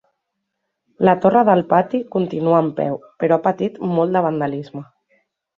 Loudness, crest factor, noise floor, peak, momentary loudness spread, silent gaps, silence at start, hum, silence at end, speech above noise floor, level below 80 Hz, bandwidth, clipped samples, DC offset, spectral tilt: -18 LUFS; 18 dB; -76 dBFS; -2 dBFS; 10 LU; none; 1 s; none; 0.75 s; 59 dB; -62 dBFS; 7 kHz; under 0.1%; under 0.1%; -9.5 dB/octave